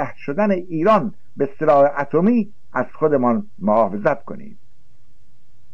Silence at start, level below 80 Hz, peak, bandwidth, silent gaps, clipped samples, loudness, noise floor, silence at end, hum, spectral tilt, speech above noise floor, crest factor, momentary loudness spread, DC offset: 0 s; -58 dBFS; -4 dBFS; 7 kHz; none; under 0.1%; -19 LUFS; -56 dBFS; 1.25 s; none; -9 dB/octave; 38 dB; 14 dB; 10 LU; 3%